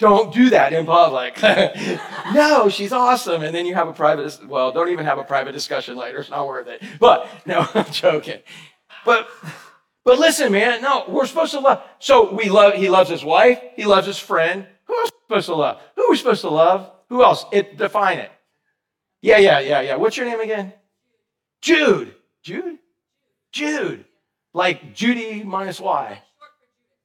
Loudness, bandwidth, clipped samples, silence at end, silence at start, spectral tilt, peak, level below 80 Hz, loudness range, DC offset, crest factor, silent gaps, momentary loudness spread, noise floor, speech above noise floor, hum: -17 LUFS; 17.5 kHz; under 0.1%; 0.85 s; 0 s; -4 dB/octave; -2 dBFS; -60 dBFS; 7 LU; under 0.1%; 16 dB; none; 14 LU; -79 dBFS; 62 dB; none